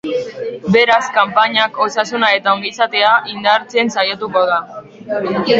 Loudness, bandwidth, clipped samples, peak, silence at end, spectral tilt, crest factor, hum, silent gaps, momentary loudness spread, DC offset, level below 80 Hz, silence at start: -14 LUFS; 8 kHz; under 0.1%; 0 dBFS; 0 s; -4 dB/octave; 16 dB; none; none; 10 LU; under 0.1%; -58 dBFS; 0.05 s